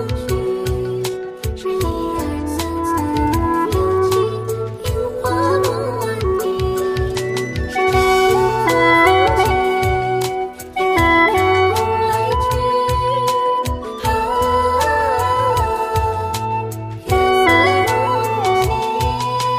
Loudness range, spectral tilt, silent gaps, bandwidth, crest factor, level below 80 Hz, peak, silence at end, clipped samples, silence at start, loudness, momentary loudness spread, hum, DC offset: 5 LU; -5 dB/octave; none; 16 kHz; 16 dB; -30 dBFS; -2 dBFS; 0 s; under 0.1%; 0 s; -17 LUFS; 10 LU; none; under 0.1%